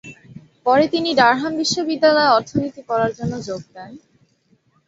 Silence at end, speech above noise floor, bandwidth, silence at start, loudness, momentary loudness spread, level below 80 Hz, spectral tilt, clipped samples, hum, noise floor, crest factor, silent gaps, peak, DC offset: 0.9 s; 43 dB; 8 kHz; 0.05 s; -18 LUFS; 16 LU; -56 dBFS; -4 dB/octave; under 0.1%; none; -61 dBFS; 18 dB; none; -2 dBFS; under 0.1%